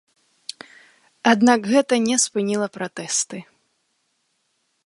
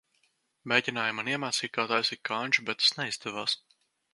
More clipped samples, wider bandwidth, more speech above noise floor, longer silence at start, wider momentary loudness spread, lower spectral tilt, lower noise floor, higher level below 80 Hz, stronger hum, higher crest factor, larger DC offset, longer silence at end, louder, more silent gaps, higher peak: neither; about the same, 11.5 kHz vs 12 kHz; first, 51 dB vs 43 dB; first, 1.25 s vs 0.65 s; first, 21 LU vs 8 LU; about the same, -3 dB/octave vs -2 dB/octave; about the same, -70 dBFS vs -73 dBFS; first, -72 dBFS vs -78 dBFS; neither; about the same, 22 dB vs 24 dB; neither; first, 1.45 s vs 0.55 s; first, -20 LUFS vs -28 LUFS; neither; first, -2 dBFS vs -6 dBFS